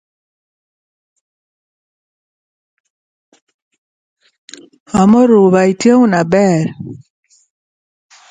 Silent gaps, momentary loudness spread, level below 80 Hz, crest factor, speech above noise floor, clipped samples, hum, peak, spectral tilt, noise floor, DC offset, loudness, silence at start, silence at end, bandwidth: none; 13 LU; -52 dBFS; 16 dB; over 79 dB; under 0.1%; none; 0 dBFS; -7 dB/octave; under -90 dBFS; under 0.1%; -11 LUFS; 4.95 s; 1.35 s; 9.4 kHz